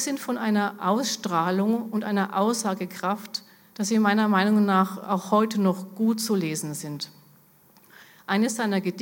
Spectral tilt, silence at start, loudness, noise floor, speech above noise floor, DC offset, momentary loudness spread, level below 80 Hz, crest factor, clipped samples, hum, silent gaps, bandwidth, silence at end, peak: -5 dB/octave; 0 s; -25 LUFS; -57 dBFS; 32 dB; under 0.1%; 12 LU; -78 dBFS; 18 dB; under 0.1%; none; none; 17.5 kHz; 0 s; -6 dBFS